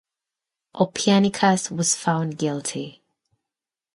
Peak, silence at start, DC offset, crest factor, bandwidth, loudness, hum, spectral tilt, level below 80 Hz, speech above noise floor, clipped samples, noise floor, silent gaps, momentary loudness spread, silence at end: -4 dBFS; 0.75 s; under 0.1%; 20 dB; 11.5 kHz; -22 LUFS; none; -4 dB/octave; -66 dBFS; 67 dB; under 0.1%; -89 dBFS; none; 11 LU; 1.05 s